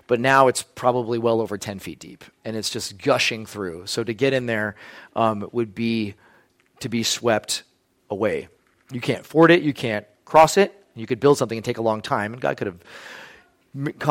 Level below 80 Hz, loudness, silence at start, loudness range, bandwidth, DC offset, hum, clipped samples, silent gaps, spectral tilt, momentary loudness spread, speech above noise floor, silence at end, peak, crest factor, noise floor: -60 dBFS; -22 LUFS; 0.1 s; 6 LU; 16.5 kHz; under 0.1%; none; under 0.1%; none; -4.5 dB/octave; 19 LU; 36 dB; 0 s; -2 dBFS; 20 dB; -58 dBFS